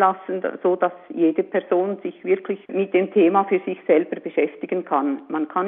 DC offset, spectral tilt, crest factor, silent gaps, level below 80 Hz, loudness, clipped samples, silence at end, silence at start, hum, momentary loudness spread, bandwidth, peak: under 0.1%; -5.5 dB/octave; 18 dB; none; -76 dBFS; -22 LUFS; under 0.1%; 0 s; 0 s; none; 9 LU; 3.8 kHz; -2 dBFS